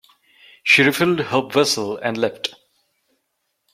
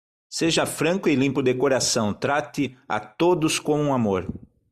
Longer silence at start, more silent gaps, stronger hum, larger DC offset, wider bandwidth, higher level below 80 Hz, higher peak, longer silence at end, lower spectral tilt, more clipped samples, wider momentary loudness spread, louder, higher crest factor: first, 0.65 s vs 0.3 s; neither; neither; neither; first, 16.5 kHz vs 14.5 kHz; second, -64 dBFS vs -56 dBFS; first, -2 dBFS vs -8 dBFS; first, 1.25 s vs 0.35 s; about the same, -3.5 dB/octave vs -4.5 dB/octave; neither; first, 12 LU vs 9 LU; first, -18 LUFS vs -23 LUFS; first, 20 dB vs 14 dB